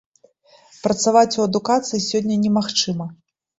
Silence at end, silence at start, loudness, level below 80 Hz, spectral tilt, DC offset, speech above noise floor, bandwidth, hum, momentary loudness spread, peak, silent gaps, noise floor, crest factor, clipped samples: 0.45 s; 0.85 s; -19 LUFS; -60 dBFS; -4.5 dB/octave; under 0.1%; 35 dB; 8 kHz; none; 10 LU; -2 dBFS; none; -54 dBFS; 18 dB; under 0.1%